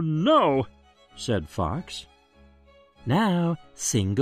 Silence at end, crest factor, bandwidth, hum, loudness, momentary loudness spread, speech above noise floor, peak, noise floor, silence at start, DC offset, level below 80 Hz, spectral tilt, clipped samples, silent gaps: 0 s; 18 dB; 14 kHz; none; -25 LUFS; 17 LU; 32 dB; -8 dBFS; -56 dBFS; 0 s; under 0.1%; -50 dBFS; -5.5 dB/octave; under 0.1%; none